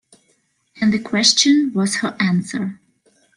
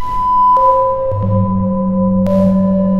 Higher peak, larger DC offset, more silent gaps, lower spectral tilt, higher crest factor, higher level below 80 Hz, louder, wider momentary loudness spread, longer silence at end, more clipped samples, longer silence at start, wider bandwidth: about the same, 0 dBFS vs -2 dBFS; neither; neither; second, -3 dB/octave vs -11 dB/octave; first, 20 dB vs 10 dB; second, -62 dBFS vs -32 dBFS; second, -17 LUFS vs -13 LUFS; first, 13 LU vs 6 LU; first, 0.6 s vs 0 s; neither; first, 0.75 s vs 0 s; first, 11.5 kHz vs 5.2 kHz